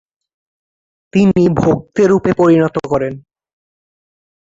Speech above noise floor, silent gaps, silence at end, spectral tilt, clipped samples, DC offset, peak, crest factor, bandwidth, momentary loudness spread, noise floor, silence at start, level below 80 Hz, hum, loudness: over 78 dB; none; 1.35 s; -8 dB/octave; under 0.1%; under 0.1%; -2 dBFS; 14 dB; 7.8 kHz; 7 LU; under -90 dBFS; 1.15 s; -44 dBFS; none; -13 LUFS